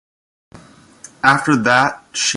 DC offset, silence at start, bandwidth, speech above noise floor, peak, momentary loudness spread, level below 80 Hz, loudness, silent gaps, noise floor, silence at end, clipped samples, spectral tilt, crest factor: under 0.1%; 0.55 s; 11.5 kHz; 28 dB; 0 dBFS; 6 LU; -56 dBFS; -15 LUFS; none; -44 dBFS; 0 s; under 0.1%; -3 dB/octave; 18 dB